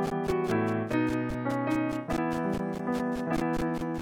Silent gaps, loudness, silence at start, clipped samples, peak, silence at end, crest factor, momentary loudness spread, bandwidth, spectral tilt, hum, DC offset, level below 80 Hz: none; -30 LUFS; 0 s; under 0.1%; -16 dBFS; 0 s; 14 dB; 3 LU; 17 kHz; -7 dB/octave; none; under 0.1%; -48 dBFS